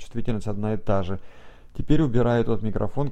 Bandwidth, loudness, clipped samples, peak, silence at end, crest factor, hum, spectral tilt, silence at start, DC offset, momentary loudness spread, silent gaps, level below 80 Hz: 8.6 kHz; -25 LUFS; under 0.1%; -4 dBFS; 0 s; 18 dB; none; -8.5 dB/octave; 0 s; under 0.1%; 14 LU; none; -34 dBFS